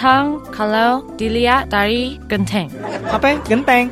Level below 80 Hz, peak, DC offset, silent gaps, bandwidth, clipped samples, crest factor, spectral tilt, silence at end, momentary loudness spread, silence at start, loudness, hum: -36 dBFS; 0 dBFS; under 0.1%; none; 15.5 kHz; under 0.1%; 16 dB; -5.5 dB/octave; 0 s; 8 LU; 0 s; -17 LUFS; none